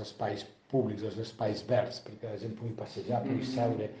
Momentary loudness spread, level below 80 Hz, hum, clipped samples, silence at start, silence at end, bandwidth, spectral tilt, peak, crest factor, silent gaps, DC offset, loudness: 9 LU; -70 dBFS; none; under 0.1%; 0 s; 0 s; 9 kHz; -7 dB/octave; -16 dBFS; 18 dB; none; under 0.1%; -34 LUFS